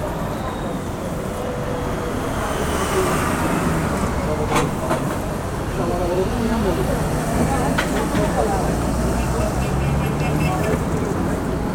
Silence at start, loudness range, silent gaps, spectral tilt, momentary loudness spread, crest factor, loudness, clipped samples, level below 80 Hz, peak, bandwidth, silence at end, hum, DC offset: 0 s; 2 LU; none; -6 dB/octave; 6 LU; 16 dB; -21 LUFS; under 0.1%; -30 dBFS; -4 dBFS; 19 kHz; 0 s; none; under 0.1%